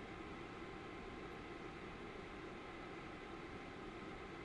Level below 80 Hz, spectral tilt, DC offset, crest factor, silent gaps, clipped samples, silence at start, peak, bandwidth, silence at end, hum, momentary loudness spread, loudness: -64 dBFS; -5.5 dB/octave; under 0.1%; 12 dB; none; under 0.1%; 0 s; -38 dBFS; 11 kHz; 0 s; none; 0 LU; -51 LUFS